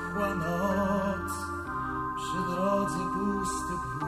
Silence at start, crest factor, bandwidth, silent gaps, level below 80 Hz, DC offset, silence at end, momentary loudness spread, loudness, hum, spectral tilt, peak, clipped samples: 0 s; 14 dB; 15.5 kHz; none; -48 dBFS; under 0.1%; 0 s; 6 LU; -30 LUFS; none; -5.5 dB/octave; -16 dBFS; under 0.1%